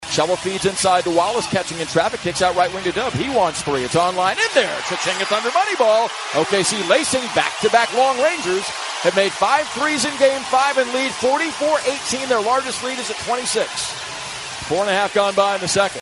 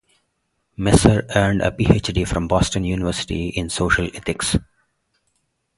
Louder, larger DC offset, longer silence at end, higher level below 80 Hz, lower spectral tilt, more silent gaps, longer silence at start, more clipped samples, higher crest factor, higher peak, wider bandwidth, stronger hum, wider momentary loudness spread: about the same, -18 LUFS vs -19 LUFS; neither; second, 0 s vs 1.15 s; second, -52 dBFS vs -32 dBFS; second, -2.5 dB/octave vs -5 dB/octave; neither; second, 0 s vs 0.8 s; neither; about the same, 18 dB vs 20 dB; about the same, 0 dBFS vs 0 dBFS; about the same, 11.5 kHz vs 11.5 kHz; neither; second, 6 LU vs 9 LU